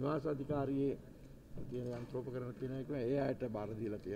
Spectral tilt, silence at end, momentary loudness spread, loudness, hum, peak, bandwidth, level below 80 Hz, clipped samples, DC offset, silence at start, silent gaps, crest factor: -9 dB/octave; 0 s; 13 LU; -40 LUFS; none; -26 dBFS; 15.5 kHz; -60 dBFS; under 0.1%; under 0.1%; 0 s; none; 14 dB